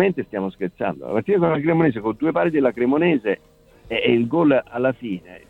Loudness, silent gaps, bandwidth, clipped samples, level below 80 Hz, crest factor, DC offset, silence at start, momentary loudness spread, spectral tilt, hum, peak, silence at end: -21 LUFS; none; 4.2 kHz; under 0.1%; -56 dBFS; 16 dB; under 0.1%; 0 s; 9 LU; -9 dB/octave; none; -4 dBFS; 0.1 s